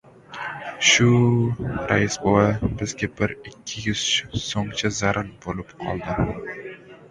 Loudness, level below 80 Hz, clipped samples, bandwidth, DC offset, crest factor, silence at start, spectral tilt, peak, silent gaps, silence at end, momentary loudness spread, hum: -22 LUFS; -42 dBFS; under 0.1%; 11 kHz; under 0.1%; 20 dB; 0.05 s; -4 dB/octave; -4 dBFS; none; 0.05 s; 16 LU; none